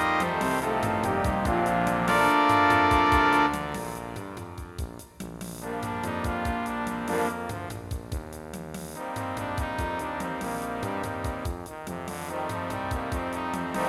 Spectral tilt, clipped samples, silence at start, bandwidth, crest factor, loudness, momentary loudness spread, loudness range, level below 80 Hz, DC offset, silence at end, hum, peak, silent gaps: -5 dB/octave; under 0.1%; 0 s; 16.5 kHz; 20 dB; -27 LUFS; 17 LU; 10 LU; -42 dBFS; under 0.1%; 0 s; none; -8 dBFS; none